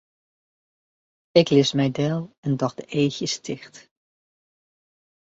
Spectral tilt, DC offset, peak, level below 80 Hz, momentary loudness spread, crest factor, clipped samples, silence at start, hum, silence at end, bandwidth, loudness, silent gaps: -5.5 dB/octave; under 0.1%; -2 dBFS; -64 dBFS; 11 LU; 24 dB; under 0.1%; 1.35 s; none; 1.65 s; 8 kHz; -22 LUFS; 2.38-2.43 s